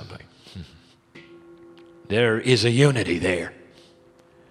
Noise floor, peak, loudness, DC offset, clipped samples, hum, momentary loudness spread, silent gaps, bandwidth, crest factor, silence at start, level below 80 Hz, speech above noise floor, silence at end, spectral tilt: -54 dBFS; -4 dBFS; -21 LUFS; under 0.1%; under 0.1%; none; 24 LU; none; 12.5 kHz; 22 dB; 0 s; -56 dBFS; 34 dB; 1 s; -5.5 dB/octave